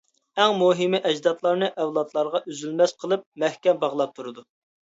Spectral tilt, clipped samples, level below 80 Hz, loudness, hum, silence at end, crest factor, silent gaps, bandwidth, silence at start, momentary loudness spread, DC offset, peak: -4.5 dB/octave; under 0.1%; -76 dBFS; -23 LUFS; none; 0.45 s; 20 dB; 3.26-3.32 s; 8 kHz; 0.35 s; 9 LU; under 0.1%; -4 dBFS